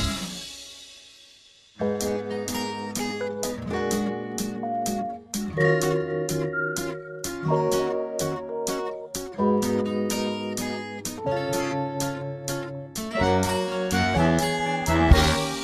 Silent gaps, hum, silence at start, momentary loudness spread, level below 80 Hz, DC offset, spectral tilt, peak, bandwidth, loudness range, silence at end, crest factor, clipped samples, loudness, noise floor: none; none; 0 s; 11 LU; -36 dBFS; under 0.1%; -4.5 dB/octave; -2 dBFS; 15 kHz; 4 LU; 0 s; 24 dB; under 0.1%; -26 LUFS; -54 dBFS